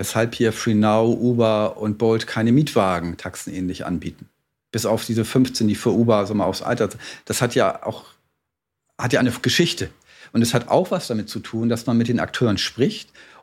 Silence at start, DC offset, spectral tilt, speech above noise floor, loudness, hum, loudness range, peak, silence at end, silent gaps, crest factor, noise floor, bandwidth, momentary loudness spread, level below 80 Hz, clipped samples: 0 s; under 0.1%; -5.5 dB/octave; 60 dB; -21 LUFS; none; 3 LU; -2 dBFS; 0.2 s; none; 18 dB; -80 dBFS; 16.5 kHz; 11 LU; -54 dBFS; under 0.1%